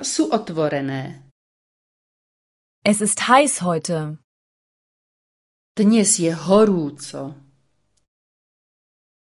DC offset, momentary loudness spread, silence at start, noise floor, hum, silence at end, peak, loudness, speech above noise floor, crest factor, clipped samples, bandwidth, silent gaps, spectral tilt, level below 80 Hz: under 0.1%; 18 LU; 0 s; -68 dBFS; none; 1.95 s; 0 dBFS; -18 LUFS; 49 dB; 22 dB; under 0.1%; 11.5 kHz; 1.31-2.82 s, 4.24-5.75 s; -4 dB/octave; -64 dBFS